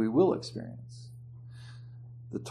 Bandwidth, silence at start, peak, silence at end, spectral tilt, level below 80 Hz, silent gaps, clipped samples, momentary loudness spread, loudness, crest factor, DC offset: 11 kHz; 0 s; -14 dBFS; 0 s; -7.5 dB/octave; -66 dBFS; none; under 0.1%; 22 LU; -31 LUFS; 20 dB; under 0.1%